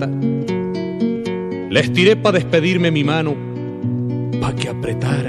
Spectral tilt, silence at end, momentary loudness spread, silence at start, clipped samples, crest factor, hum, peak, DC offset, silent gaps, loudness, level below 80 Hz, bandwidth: -6.5 dB/octave; 0 s; 10 LU; 0 s; under 0.1%; 18 dB; none; 0 dBFS; under 0.1%; none; -18 LUFS; -46 dBFS; 11.5 kHz